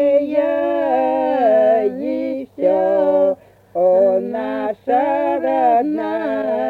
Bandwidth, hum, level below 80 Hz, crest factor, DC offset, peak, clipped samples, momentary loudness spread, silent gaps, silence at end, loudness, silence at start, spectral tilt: 4.8 kHz; none; -62 dBFS; 12 dB; under 0.1%; -4 dBFS; under 0.1%; 9 LU; none; 0 s; -17 LUFS; 0 s; -7.5 dB/octave